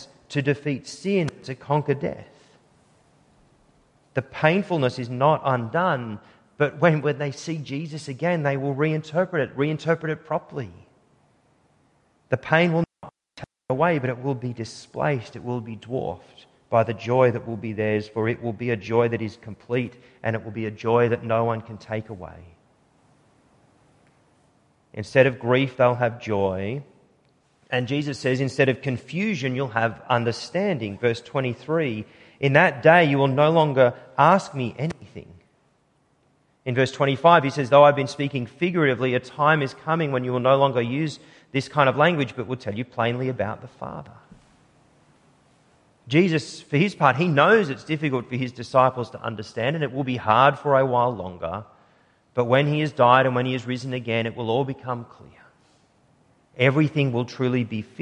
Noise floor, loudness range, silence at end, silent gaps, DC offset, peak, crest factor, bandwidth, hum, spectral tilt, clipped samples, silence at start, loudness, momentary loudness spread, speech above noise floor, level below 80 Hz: -65 dBFS; 8 LU; 0 s; none; under 0.1%; -2 dBFS; 22 dB; 10.5 kHz; none; -6.5 dB/octave; under 0.1%; 0 s; -23 LUFS; 14 LU; 42 dB; -58 dBFS